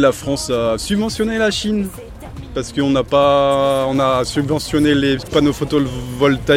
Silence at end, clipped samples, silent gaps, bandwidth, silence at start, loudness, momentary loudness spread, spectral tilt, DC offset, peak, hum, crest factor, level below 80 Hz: 0 s; under 0.1%; none; 16.5 kHz; 0 s; -17 LUFS; 9 LU; -5 dB/octave; under 0.1%; -2 dBFS; none; 14 dB; -36 dBFS